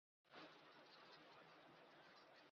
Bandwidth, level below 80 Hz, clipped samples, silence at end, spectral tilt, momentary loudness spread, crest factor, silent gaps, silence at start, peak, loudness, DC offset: 6.8 kHz; under -90 dBFS; under 0.1%; 0 s; -1.5 dB/octave; 4 LU; 18 dB; none; 0.25 s; -50 dBFS; -65 LUFS; under 0.1%